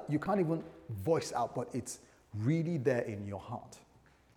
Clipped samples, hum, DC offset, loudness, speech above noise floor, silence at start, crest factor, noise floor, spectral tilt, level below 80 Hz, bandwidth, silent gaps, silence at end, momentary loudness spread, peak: under 0.1%; none; under 0.1%; -35 LUFS; 30 dB; 0 s; 18 dB; -64 dBFS; -6.5 dB/octave; -68 dBFS; 19 kHz; none; 0.55 s; 14 LU; -18 dBFS